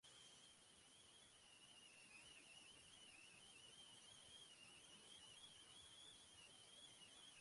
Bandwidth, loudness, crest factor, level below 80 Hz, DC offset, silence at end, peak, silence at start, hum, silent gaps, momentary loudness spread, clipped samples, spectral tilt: 11.5 kHz; -63 LUFS; 14 dB; -88 dBFS; under 0.1%; 0 s; -52 dBFS; 0.05 s; none; none; 4 LU; under 0.1%; -0.5 dB/octave